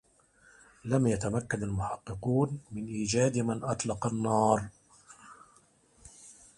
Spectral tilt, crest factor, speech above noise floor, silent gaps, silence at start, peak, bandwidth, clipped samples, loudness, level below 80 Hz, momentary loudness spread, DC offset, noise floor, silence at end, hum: -6 dB/octave; 20 dB; 34 dB; none; 0.85 s; -12 dBFS; 11.5 kHz; under 0.1%; -30 LUFS; -56 dBFS; 20 LU; under 0.1%; -64 dBFS; 0.25 s; none